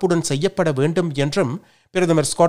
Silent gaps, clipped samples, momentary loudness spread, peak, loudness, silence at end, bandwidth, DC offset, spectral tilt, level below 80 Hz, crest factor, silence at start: none; under 0.1%; 7 LU; -2 dBFS; -20 LUFS; 0 s; 16 kHz; under 0.1%; -5.5 dB/octave; -54 dBFS; 16 dB; 0 s